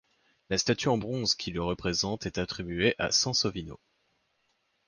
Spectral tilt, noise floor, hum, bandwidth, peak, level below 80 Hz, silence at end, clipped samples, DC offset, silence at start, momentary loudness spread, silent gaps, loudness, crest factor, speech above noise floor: -3.5 dB/octave; -74 dBFS; none; 11 kHz; -12 dBFS; -52 dBFS; 1.1 s; under 0.1%; under 0.1%; 0.5 s; 9 LU; none; -28 LUFS; 20 dB; 45 dB